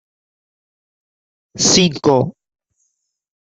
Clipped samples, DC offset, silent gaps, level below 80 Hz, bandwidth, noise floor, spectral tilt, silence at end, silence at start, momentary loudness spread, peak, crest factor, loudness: under 0.1%; under 0.1%; none; -52 dBFS; 8.4 kHz; -70 dBFS; -3.5 dB/octave; 1.15 s; 1.55 s; 7 LU; 0 dBFS; 20 dB; -14 LUFS